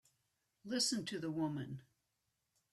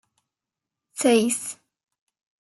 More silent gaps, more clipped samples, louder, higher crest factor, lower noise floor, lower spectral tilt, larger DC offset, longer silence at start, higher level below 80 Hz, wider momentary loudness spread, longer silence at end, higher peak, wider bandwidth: neither; neither; second, -39 LUFS vs -22 LUFS; about the same, 20 dB vs 20 dB; about the same, -86 dBFS vs -87 dBFS; about the same, -3.5 dB/octave vs -3 dB/octave; neither; second, 0.65 s vs 0.95 s; about the same, -80 dBFS vs -78 dBFS; second, 16 LU vs 20 LU; about the same, 0.9 s vs 0.9 s; second, -24 dBFS vs -8 dBFS; first, 14 kHz vs 12.5 kHz